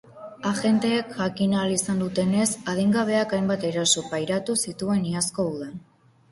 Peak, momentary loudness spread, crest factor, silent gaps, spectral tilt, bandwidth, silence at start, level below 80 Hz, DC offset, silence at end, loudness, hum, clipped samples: -8 dBFS; 7 LU; 18 dB; none; -4 dB/octave; 12 kHz; 0.05 s; -60 dBFS; under 0.1%; 0.5 s; -24 LUFS; none; under 0.1%